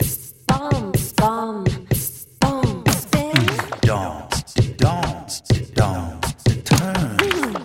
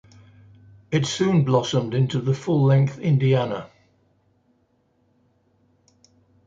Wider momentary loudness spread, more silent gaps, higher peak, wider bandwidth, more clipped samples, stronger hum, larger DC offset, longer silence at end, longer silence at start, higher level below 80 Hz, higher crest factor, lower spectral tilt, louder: about the same, 7 LU vs 6 LU; neither; first, 0 dBFS vs -6 dBFS; first, 16.5 kHz vs 7.8 kHz; neither; neither; neither; second, 0 s vs 2.8 s; second, 0 s vs 0.9 s; first, -36 dBFS vs -60 dBFS; about the same, 20 dB vs 18 dB; second, -5 dB/octave vs -7 dB/octave; about the same, -20 LUFS vs -21 LUFS